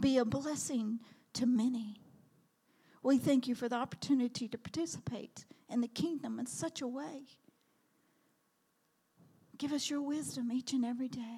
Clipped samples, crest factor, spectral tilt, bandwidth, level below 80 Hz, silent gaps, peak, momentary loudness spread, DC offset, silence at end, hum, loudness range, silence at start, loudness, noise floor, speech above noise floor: under 0.1%; 18 dB; -4.5 dB/octave; 15 kHz; -74 dBFS; none; -20 dBFS; 12 LU; under 0.1%; 0 s; none; 9 LU; 0 s; -36 LUFS; -77 dBFS; 42 dB